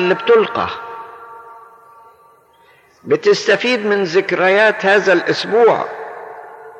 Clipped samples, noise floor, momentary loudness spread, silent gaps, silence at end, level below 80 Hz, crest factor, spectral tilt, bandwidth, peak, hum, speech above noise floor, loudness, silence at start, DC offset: under 0.1%; -50 dBFS; 21 LU; none; 0 s; -62 dBFS; 14 dB; -4.5 dB/octave; 9 kHz; -4 dBFS; none; 36 dB; -14 LUFS; 0 s; under 0.1%